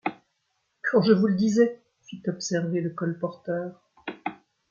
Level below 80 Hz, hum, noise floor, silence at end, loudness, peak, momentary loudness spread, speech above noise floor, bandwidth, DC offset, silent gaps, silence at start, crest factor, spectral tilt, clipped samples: -70 dBFS; none; -75 dBFS; 0.35 s; -26 LUFS; -6 dBFS; 18 LU; 51 dB; 7.4 kHz; under 0.1%; none; 0.05 s; 20 dB; -6 dB/octave; under 0.1%